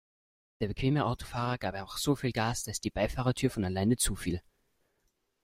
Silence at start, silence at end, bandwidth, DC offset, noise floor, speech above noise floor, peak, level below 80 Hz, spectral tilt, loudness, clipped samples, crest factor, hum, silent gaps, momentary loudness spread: 0.6 s; 1.05 s; 16 kHz; under 0.1%; -77 dBFS; 46 dB; -14 dBFS; -48 dBFS; -5 dB/octave; -32 LUFS; under 0.1%; 18 dB; none; none; 7 LU